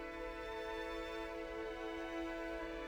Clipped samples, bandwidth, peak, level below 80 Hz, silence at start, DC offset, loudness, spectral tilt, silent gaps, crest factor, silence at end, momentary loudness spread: under 0.1%; over 20 kHz; -32 dBFS; -56 dBFS; 0 s; under 0.1%; -44 LUFS; -4.5 dB/octave; none; 12 dB; 0 s; 2 LU